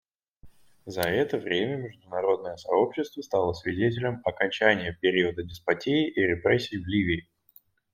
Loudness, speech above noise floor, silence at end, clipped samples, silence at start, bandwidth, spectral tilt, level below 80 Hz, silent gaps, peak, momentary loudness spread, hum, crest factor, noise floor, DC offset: -27 LUFS; 34 dB; 0.75 s; under 0.1%; 0.45 s; 16.5 kHz; -6 dB/octave; -58 dBFS; none; -4 dBFS; 7 LU; none; 24 dB; -60 dBFS; under 0.1%